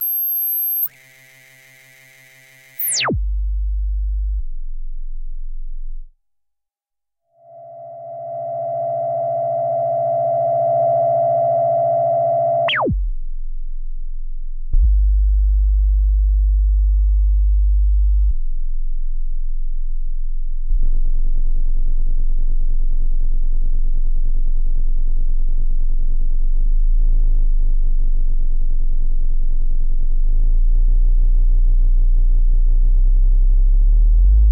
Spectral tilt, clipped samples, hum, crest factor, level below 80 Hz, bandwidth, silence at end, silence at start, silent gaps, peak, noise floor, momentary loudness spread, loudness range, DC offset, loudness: -5.5 dB/octave; under 0.1%; none; 10 dB; -16 dBFS; 16.5 kHz; 0 s; 0 s; none; -6 dBFS; -81 dBFS; 17 LU; 10 LU; under 0.1%; -21 LUFS